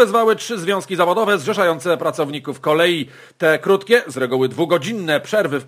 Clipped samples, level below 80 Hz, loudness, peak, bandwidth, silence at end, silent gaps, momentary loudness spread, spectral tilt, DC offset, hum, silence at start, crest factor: under 0.1%; -70 dBFS; -18 LUFS; 0 dBFS; 15.5 kHz; 0 s; none; 6 LU; -4.5 dB/octave; under 0.1%; none; 0 s; 18 dB